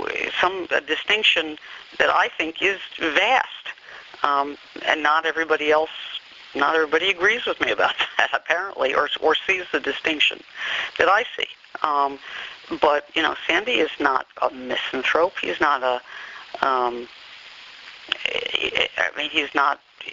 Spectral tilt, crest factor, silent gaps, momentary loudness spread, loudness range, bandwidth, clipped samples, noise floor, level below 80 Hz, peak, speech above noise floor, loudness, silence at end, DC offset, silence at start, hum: 1.5 dB/octave; 22 dB; none; 15 LU; 3 LU; 7.6 kHz; under 0.1%; -43 dBFS; -60 dBFS; 0 dBFS; 21 dB; -21 LUFS; 0 s; under 0.1%; 0 s; none